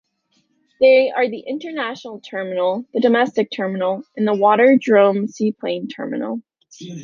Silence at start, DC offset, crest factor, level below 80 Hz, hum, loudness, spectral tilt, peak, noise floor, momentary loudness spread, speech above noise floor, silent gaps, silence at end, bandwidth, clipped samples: 0.8 s; under 0.1%; 16 dB; -68 dBFS; none; -18 LUFS; -6 dB/octave; -2 dBFS; -65 dBFS; 15 LU; 48 dB; none; 0 s; 7.2 kHz; under 0.1%